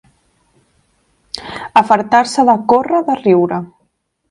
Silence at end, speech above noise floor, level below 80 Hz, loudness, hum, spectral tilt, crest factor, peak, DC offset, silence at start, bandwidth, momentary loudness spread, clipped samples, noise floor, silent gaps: 0.65 s; 52 dB; -56 dBFS; -13 LUFS; none; -5.5 dB/octave; 16 dB; 0 dBFS; under 0.1%; 1.35 s; 11.5 kHz; 16 LU; under 0.1%; -64 dBFS; none